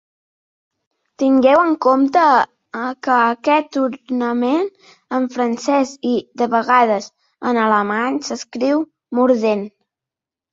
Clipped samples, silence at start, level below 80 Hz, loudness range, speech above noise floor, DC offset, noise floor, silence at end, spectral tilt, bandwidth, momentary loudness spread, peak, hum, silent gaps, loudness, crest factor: under 0.1%; 1.2 s; -64 dBFS; 4 LU; 71 dB; under 0.1%; -87 dBFS; 0.85 s; -4.5 dB/octave; 7.8 kHz; 11 LU; -2 dBFS; none; none; -17 LUFS; 16 dB